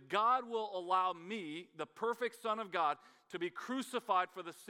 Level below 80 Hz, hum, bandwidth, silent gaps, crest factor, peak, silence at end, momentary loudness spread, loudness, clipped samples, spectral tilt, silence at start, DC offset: under -90 dBFS; none; 17 kHz; none; 18 dB; -18 dBFS; 0 s; 12 LU; -37 LUFS; under 0.1%; -4 dB/octave; 0 s; under 0.1%